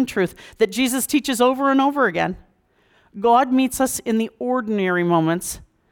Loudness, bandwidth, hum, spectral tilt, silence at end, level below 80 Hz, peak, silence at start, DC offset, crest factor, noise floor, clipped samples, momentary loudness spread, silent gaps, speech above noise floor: -20 LUFS; 19.5 kHz; none; -4.5 dB/octave; 0.35 s; -52 dBFS; -6 dBFS; 0 s; under 0.1%; 14 dB; -60 dBFS; under 0.1%; 9 LU; none; 41 dB